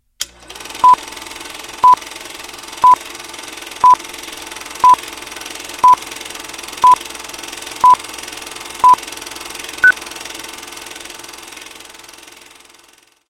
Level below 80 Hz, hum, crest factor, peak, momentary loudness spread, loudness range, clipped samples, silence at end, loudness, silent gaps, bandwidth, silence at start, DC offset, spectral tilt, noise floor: -52 dBFS; 60 Hz at -55 dBFS; 16 dB; 0 dBFS; 18 LU; 5 LU; under 0.1%; 2.9 s; -12 LUFS; none; 17 kHz; 0.2 s; under 0.1%; -0.5 dB/octave; -50 dBFS